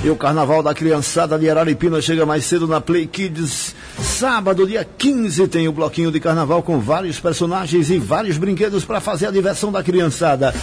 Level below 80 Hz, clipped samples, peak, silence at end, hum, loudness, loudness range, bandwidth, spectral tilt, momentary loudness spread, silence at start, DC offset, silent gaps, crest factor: -42 dBFS; under 0.1%; -6 dBFS; 0 s; none; -17 LUFS; 1 LU; 11 kHz; -5 dB/octave; 5 LU; 0 s; under 0.1%; none; 10 dB